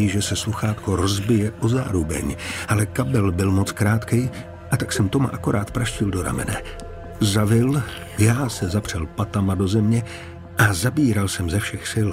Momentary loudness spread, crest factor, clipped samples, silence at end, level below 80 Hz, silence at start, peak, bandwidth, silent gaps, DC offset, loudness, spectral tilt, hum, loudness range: 9 LU; 16 dB; under 0.1%; 0 s; -40 dBFS; 0 s; -4 dBFS; 16 kHz; none; under 0.1%; -22 LUFS; -5.5 dB/octave; none; 2 LU